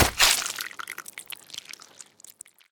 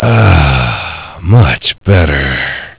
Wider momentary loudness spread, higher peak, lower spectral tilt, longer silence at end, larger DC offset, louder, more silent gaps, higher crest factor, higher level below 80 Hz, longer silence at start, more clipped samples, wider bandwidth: first, 26 LU vs 10 LU; about the same, 0 dBFS vs 0 dBFS; second, -1 dB/octave vs -10.5 dB/octave; first, 0.4 s vs 0.1 s; neither; second, -23 LUFS vs -10 LUFS; neither; first, 28 dB vs 10 dB; second, -46 dBFS vs -18 dBFS; about the same, 0 s vs 0 s; second, under 0.1% vs 1%; first, over 20 kHz vs 4 kHz